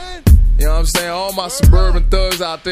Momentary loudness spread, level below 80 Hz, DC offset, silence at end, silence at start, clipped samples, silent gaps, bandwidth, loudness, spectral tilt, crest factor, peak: 8 LU; -12 dBFS; under 0.1%; 0 s; 0 s; under 0.1%; none; 15.5 kHz; -15 LUFS; -5 dB/octave; 12 dB; 0 dBFS